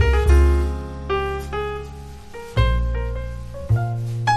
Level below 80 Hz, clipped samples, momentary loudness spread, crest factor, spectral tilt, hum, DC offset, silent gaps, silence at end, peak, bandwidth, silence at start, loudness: -22 dBFS; under 0.1%; 18 LU; 16 dB; -6.5 dB/octave; none; under 0.1%; none; 0 s; -4 dBFS; 12 kHz; 0 s; -22 LUFS